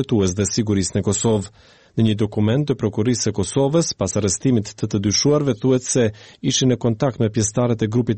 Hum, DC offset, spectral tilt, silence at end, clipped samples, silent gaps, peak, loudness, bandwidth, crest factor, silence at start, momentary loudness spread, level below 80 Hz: none; 0.1%; -5 dB/octave; 0 s; under 0.1%; none; -6 dBFS; -20 LUFS; 8.8 kHz; 12 dB; 0 s; 4 LU; -48 dBFS